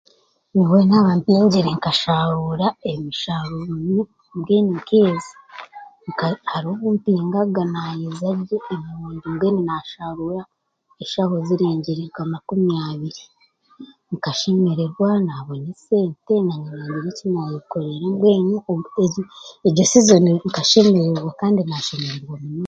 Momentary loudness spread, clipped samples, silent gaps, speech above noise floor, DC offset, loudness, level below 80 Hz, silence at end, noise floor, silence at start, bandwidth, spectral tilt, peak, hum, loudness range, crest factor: 16 LU; under 0.1%; none; 25 dB; under 0.1%; -19 LUFS; -58 dBFS; 0 s; -44 dBFS; 0.55 s; 8.6 kHz; -5.5 dB/octave; 0 dBFS; none; 7 LU; 20 dB